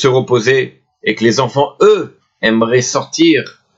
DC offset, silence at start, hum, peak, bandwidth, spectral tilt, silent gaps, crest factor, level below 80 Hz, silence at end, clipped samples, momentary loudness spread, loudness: under 0.1%; 0 s; none; 0 dBFS; 8 kHz; -4.5 dB/octave; none; 12 dB; -56 dBFS; 0.25 s; under 0.1%; 7 LU; -13 LUFS